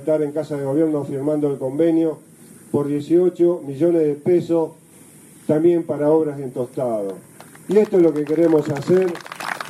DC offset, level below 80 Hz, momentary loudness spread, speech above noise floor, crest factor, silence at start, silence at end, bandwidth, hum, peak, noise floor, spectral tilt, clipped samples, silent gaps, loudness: under 0.1%; -66 dBFS; 10 LU; 28 dB; 14 dB; 0 s; 0 s; 13.5 kHz; none; -6 dBFS; -46 dBFS; -7.5 dB/octave; under 0.1%; none; -19 LUFS